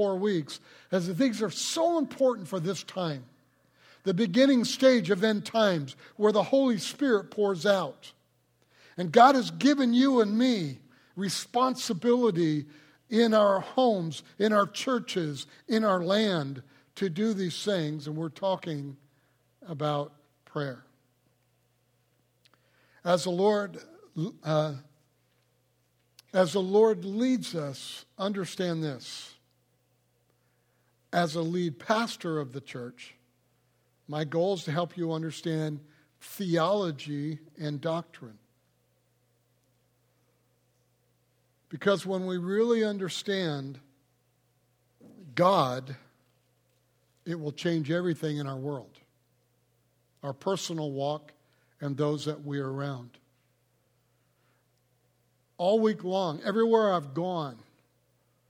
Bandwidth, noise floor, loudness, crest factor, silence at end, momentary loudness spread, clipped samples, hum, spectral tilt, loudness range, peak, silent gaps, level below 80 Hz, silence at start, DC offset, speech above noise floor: 16.5 kHz; -71 dBFS; -28 LUFS; 24 dB; 0.95 s; 16 LU; under 0.1%; none; -5.5 dB/octave; 11 LU; -6 dBFS; none; -78 dBFS; 0 s; under 0.1%; 43 dB